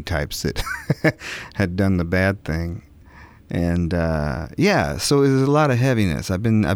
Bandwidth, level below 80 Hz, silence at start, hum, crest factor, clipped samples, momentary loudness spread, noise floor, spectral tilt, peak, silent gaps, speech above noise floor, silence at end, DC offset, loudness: 18 kHz; -36 dBFS; 0 s; none; 16 dB; under 0.1%; 10 LU; -45 dBFS; -6 dB/octave; -4 dBFS; none; 25 dB; 0 s; under 0.1%; -21 LUFS